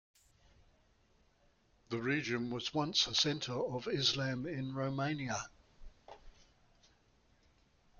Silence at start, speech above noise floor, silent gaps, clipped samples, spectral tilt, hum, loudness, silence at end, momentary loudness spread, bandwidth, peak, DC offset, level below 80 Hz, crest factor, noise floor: 1.9 s; 35 dB; none; under 0.1%; -4 dB/octave; none; -35 LUFS; 1.7 s; 9 LU; 7.8 kHz; -18 dBFS; under 0.1%; -64 dBFS; 22 dB; -71 dBFS